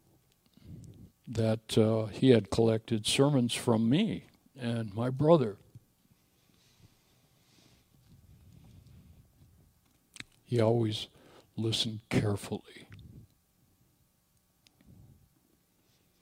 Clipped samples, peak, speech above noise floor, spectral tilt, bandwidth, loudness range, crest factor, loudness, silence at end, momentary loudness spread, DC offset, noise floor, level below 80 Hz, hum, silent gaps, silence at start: under 0.1%; -8 dBFS; 43 dB; -6 dB/octave; 16 kHz; 10 LU; 24 dB; -29 LUFS; 3 s; 25 LU; under 0.1%; -71 dBFS; -62 dBFS; none; none; 0.7 s